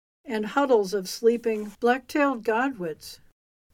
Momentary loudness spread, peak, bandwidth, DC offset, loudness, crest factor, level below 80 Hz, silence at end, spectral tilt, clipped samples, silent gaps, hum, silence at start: 12 LU; -8 dBFS; 16.5 kHz; under 0.1%; -25 LUFS; 18 dB; -64 dBFS; 0.6 s; -4.5 dB/octave; under 0.1%; none; none; 0.25 s